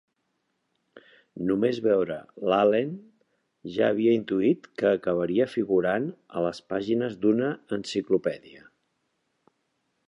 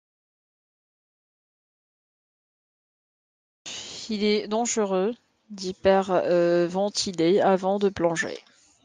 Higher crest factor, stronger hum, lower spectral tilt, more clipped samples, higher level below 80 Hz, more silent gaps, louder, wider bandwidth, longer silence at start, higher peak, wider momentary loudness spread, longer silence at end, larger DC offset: about the same, 18 dB vs 18 dB; neither; first, -7 dB/octave vs -4.5 dB/octave; neither; about the same, -66 dBFS vs -64 dBFS; neither; about the same, -26 LUFS vs -24 LUFS; about the same, 10.5 kHz vs 9.8 kHz; second, 1.35 s vs 3.65 s; about the same, -10 dBFS vs -8 dBFS; second, 10 LU vs 15 LU; first, 1.5 s vs 0.45 s; neither